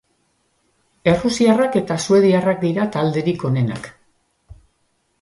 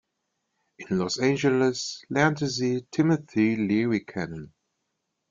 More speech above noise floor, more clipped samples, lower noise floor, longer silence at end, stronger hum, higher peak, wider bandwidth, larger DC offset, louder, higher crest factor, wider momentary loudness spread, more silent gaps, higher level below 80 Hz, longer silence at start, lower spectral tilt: second, 49 dB vs 54 dB; neither; second, -66 dBFS vs -79 dBFS; about the same, 0.7 s vs 0.8 s; neither; first, -2 dBFS vs -8 dBFS; first, 11.5 kHz vs 7.6 kHz; neither; first, -18 LUFS vs -25 LUFS; about the same, 18 dB vs 18 dB; second, 8 LU vs 11 LU; neither; first, -50 dBFS vs -64 dBFS; first, 1.05 s vs 0.8 s; about the same, -6 dB/octave vs -5.5 dB/octave